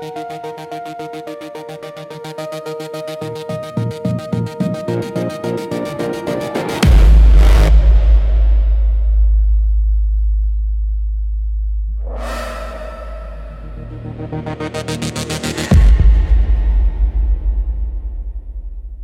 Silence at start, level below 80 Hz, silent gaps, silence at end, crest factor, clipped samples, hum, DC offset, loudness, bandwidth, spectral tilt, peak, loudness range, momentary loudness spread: 0 s; -14 dBFS; none; 0 s; 12 dB; under 0.1%; none; under 0.1%; -17 LUFS; 11.5 kHz; -6.5 dB/octave; -2 dBFS; 13 LU; 18 LU